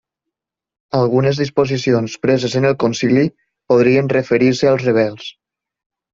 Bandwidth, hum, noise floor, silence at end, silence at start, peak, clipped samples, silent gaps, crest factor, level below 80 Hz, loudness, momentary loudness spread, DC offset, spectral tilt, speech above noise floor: 7.6 kHz; none; -82 dBFS; 0.85 s; 0.95 s; -2 dBFS; under 0.1%; none; 14 dB; -54 dBFS; -16 LUFS; 6 LU; under 0.1%; -6.5 dB/octave; 67 dB